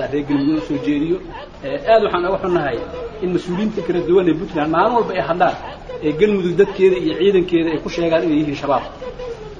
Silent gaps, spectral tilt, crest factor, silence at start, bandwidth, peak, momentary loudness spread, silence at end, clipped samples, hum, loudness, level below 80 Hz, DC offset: none; -7 dB/octave; 16 dB; 0 s; 7.6 kHz; -2 dBFS; 12 LU; 0 s; under 0.1%; none; -18 LUFS; -42 dBFS; under 0.1%